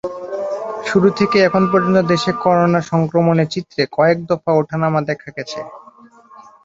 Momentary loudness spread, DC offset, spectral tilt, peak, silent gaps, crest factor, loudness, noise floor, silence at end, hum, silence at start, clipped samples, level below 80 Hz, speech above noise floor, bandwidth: 12 LU; under 0.1%; -6.5 dB/octave; 0 dBFS; none; 16 dB; -16 LUFS; -44 dBFS; 0.25 s; none; 0.05 s; under 0.1%; -54 dBFS; 29 dB; 7.8 kHz